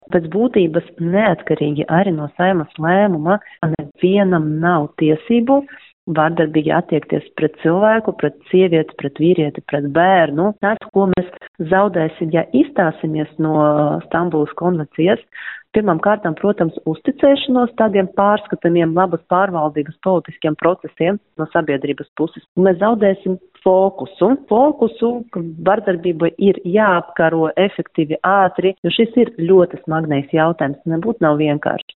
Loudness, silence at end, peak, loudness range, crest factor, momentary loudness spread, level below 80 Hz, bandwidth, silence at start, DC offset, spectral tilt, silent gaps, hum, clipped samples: -16 LUFS; 0.2 s; -2 dBFS; 2 LU; 14 dB; 7 LU; -54 dBFS; 4.1 kHz; 0.1 s; under 0.1%; -5.5 dB/octave; 5.93-6.07 s, 10.89-10.93 s, 11.48-11.54 s, 22.08-22.16 s, 22.48-22.55 s, 28.78-28.83 s; none; under 0.1%